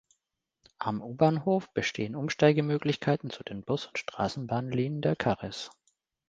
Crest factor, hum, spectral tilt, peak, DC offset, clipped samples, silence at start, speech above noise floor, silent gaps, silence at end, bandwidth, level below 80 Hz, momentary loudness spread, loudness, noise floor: 24 dB; none; -6.5 dB/octave; -8 dBFS; under 0.1%; under 0.1%; 0.8 s; 54 dB; none; 0.6 s; 7.8 kHz; -62 dBFS; 12 LU; -30 LUFS; -83 dBFS